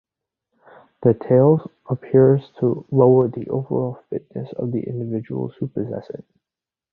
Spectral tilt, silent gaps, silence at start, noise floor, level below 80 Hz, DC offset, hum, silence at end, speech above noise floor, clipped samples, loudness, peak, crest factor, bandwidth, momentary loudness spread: -13 dB/octave; none; 1 s; -89 dBFS; -58 dBFS; under 0.1%; none; 0.8 s; 70 dB; under 0.1%; -20 LUFS; -2 dBFS; 18 dB; 4.3 kHz; 15 LU